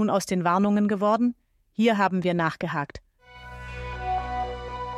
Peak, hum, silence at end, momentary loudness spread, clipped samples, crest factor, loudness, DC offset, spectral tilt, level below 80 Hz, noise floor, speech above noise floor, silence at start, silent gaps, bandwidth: -10 dBFS; none; 0 s; 17 LU; under 0.1%; 16 dB; -25 LUFS; under 0.1%; -6 dB/octave; -44 dBFS; -46 dBFS; 23 dB; 0 s; none; 13.5 kHz